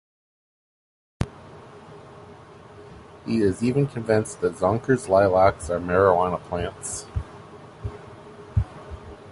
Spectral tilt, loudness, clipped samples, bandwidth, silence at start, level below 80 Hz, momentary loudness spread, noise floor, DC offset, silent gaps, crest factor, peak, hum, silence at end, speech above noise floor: -6.5 dB/octave; -23 LUFS; under 0.1%; 11.5 kHz; 1.2 s; -42 dBFS; 26 LU; -45 dBFS; under 0.1%; none; 20 dB; -4 dBFS; none; 0 s; 24 dB